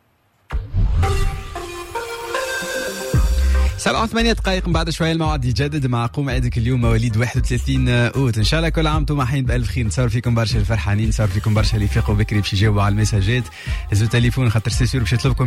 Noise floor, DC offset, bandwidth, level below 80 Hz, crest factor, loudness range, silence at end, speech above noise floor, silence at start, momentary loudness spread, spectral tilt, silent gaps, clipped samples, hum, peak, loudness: -60 dBFS; under 0.1%; 15.5 kHz; -24 dBFS; 12 dB; 3 LU; 0 s; 43 dB; 0.5 s; 7 LU; -5.5 dB/octave; none; under 0.1%; none; -6 dBFS; -19 LUFS